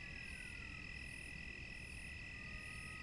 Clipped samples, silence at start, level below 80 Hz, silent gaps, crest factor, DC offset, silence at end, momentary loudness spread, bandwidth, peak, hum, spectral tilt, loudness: under 0.1%; 0 s; -58 dBFS; none; 12 dB; under 0.1%; 0 s; 1 LU; 11.5 kHz; -38 dBFS; none; -3.5 dB/octave; -49 LUFS